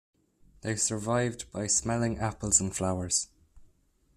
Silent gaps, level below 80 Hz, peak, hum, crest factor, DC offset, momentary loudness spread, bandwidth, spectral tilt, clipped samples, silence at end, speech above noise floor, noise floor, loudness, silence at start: none; -54 dBFS; -8 dBFS; none; 24 dB; under 0.1%; 10 LU; 14 kHz; -3.5 dB/octave; under 0.1%; 0.5 s; 37 dB; -67 dBFS; -28 LUFS; 0.65 s